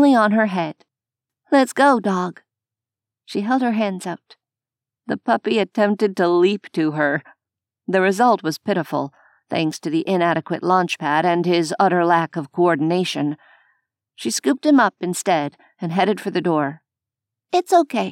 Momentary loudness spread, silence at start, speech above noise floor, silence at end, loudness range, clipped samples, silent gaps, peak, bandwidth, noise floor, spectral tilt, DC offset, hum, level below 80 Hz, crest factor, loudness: 11 LU; 0 s; 70 dB; 0 s; 3 LU; under 0.1%; none; -4 dBFS; 16 kHz; -89 dBFS; -5 dB/octave; under 0.1%; none; -82 dBFS; 16 dB; -19 LUFS